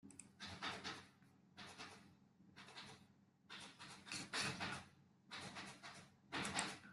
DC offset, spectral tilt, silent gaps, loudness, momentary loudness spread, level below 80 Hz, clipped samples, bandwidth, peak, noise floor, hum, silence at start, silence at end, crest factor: under 0.1%; -2.5 dB/octave; none; -49 LUFS; 20 LU; -82 dBFS; under 0.1%; 13 kHz; -24 dBFS; -71 dBFS; none; 0.05 s; 0 s; 28 dB